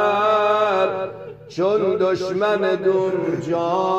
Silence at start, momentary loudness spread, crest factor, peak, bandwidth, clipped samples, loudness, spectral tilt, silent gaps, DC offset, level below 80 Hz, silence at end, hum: 0 s; 9 LU; 12 dB; -6 dBFS; 8.2 kHz; under 0.1%; -20 LUFS; -6 dB/octave; none; under 0.1%; -62 dBFS; 0 s; none